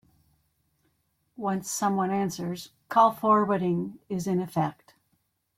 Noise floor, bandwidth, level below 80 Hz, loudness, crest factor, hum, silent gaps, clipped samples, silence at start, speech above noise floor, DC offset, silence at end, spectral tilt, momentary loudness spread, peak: -74 dBFS; 16.5 kHz; -68 dBFS; -27 LUFS; 20 dB; none; none; under 0.1%; 1.4 s; 48 dB; under 0.1%; 0.85 s; -6 dB/octave; 12 LU; -8 dBFS